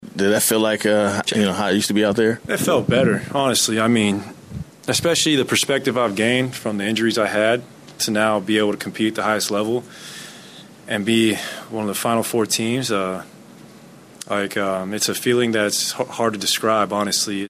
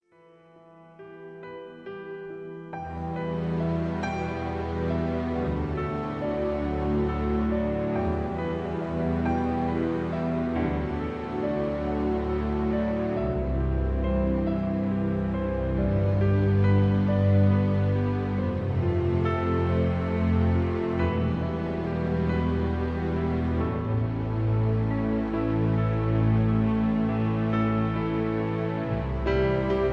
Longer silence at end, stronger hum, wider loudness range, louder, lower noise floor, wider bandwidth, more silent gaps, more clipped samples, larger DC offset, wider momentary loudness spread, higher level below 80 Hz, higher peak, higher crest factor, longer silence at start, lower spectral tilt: about the same, 0 s vs 0 s; neither; about the same, 4 LU vs 5 LU; first, -19 LUFS vs -27 LUFS; second, -44 dBFS vs -56 dBFS; first, 15.5 kHz vs 6 kHz; neither; neither; neither; first, 10 LU vs 7 LU; second, -56 dBFS vs -36 dBFS; first, -6 dBFS vs -12 dBFS; about the same, 14 dB vs 14 dB; second, 0 s vs 0.8 s; second, -3.5 dB/octave vs -9.5 dB/octave